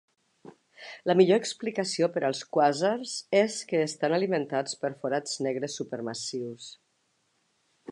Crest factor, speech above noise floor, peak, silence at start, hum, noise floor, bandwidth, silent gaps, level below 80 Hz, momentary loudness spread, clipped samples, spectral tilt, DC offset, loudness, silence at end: 22 dB; 46 dB; -8 dBFS; 0.45 s; none; -73 dBFS; 11.5 kHz; none; -82 dBFS; 11 LU; under 0.1%; -4.5 dB/octave; under 0.1%; -28 LUFS; 0 s